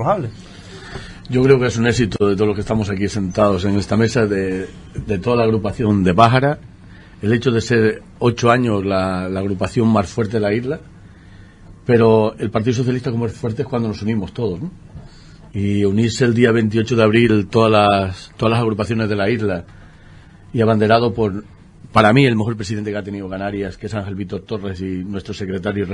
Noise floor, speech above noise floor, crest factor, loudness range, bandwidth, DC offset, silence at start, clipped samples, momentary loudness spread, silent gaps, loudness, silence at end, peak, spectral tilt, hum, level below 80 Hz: -42 dBFS; 25 dB; 18 dB; 5 LU; 10.5 kHz; under 0.1%; 0 s; under 0.1%; 13 LU; none; -17 LUFS; 0 s; 0 dBFS; -6.5 dB/octave; none; -44 dBFS